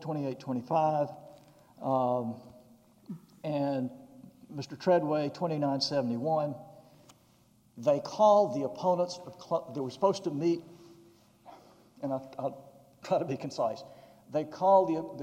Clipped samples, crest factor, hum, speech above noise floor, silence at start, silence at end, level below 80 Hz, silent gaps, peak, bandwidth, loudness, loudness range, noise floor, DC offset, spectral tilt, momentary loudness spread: under 0.1%; 20 dB; none; 34 dB; 0 s; 0 s; -76 dBFS; none; -12 dBFS; 15 kHz; -30 LUFS; 7 LU; -64 dBFS; under 0.1%; -6.5 dB/octave; 18 LU